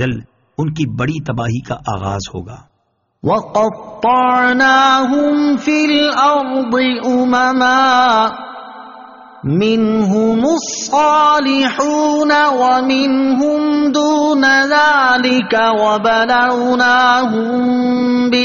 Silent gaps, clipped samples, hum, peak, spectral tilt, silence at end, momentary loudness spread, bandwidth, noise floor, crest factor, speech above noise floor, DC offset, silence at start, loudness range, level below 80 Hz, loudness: none; under 0.1%; none; 0 dBFS; -3 dB/octave; 0 s; 11 LU; 7.4 kHz; -64 dBFS; 12 dB; 51 dB; under 0.1%; 0 s; 5 LU; -50 dBFS; -13 LUFS